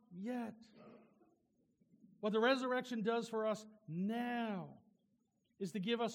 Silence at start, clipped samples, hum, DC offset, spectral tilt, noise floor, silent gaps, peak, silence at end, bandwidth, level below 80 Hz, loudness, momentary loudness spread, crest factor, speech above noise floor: 0.1 s; under 0.1%; none; under 0.1%; -5.5 dB/octave; -80 dBFS; none; -22 dBFS; 0 s; 16 kHz; under -90 dBFS; -40 LUFS; 14 LU; 18 dB; 41 dB